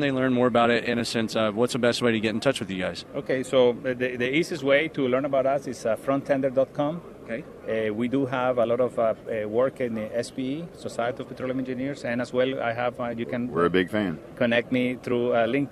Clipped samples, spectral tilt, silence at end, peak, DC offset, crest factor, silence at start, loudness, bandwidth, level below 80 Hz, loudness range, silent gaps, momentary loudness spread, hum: under 0.1%; -5.5 dB/octave; 0 s; -6 dBFS; under 0.1%; 18 dB; 0 s; -25 LUFS; 13.5 kHz; -60 dBFS; 4 LU; none; 8 LU; none